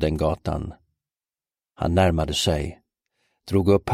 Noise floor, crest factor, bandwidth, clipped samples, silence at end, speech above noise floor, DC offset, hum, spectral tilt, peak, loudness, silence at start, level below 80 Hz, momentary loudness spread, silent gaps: under -90 dBFS; 18 dB; 15.5 kHz; under 0.1%; 0 s; over 68 dB; under 0.1%; none; -6 dB/octave; -6 dBFS; -23 LUFS; 0 s; -38 dBFS; 11 LU; none